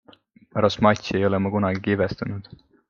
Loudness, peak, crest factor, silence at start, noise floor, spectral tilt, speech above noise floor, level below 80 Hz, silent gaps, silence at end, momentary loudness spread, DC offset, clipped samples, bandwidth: -23 LUFS; -2 dBFS; 22 dB; 0.55 s; -54 dBFS; -6.5 dB/octave; 31 dB; -54 dBFS; none; 0.5 s; 12 LU; under 0.1%; under 0.1%; 7.2 kHz